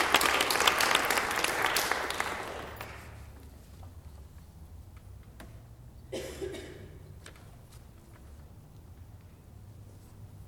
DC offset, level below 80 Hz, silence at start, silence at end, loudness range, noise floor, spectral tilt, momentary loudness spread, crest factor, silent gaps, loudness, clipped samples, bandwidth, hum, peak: under 0.1%; -54 dBFS; 0 s; 0 s; 22 LU; -51 dBFS; -1.5 dB/octave; 27 LU; 28 dB; none; -28 LUFS; under 0.1%; over 20 kHz; none; -6 dBFS